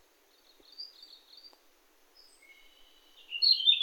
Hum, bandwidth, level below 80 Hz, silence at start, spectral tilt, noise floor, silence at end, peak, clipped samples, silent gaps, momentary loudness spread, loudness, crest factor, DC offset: none; 18 kHz; -78 dBFS; 0.8 s; 2.5 dB/octave; -65 dBFS; 0 s; -12 dBFS; under 0.1%; none; 30 LU; -24 LUFS; 24 dB; under 0.1%